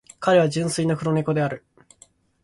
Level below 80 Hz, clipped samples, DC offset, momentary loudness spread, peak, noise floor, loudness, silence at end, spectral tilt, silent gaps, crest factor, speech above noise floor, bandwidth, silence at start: -58 dBFS; under 0.1%; under 0.1%; 8 LU; -8 dBFS; -56 dBFS; -22 LUFS; 0.85 s; -6 dB/octave; none; 16 dB; 35 dB; 11.5 kHz; 0.2 s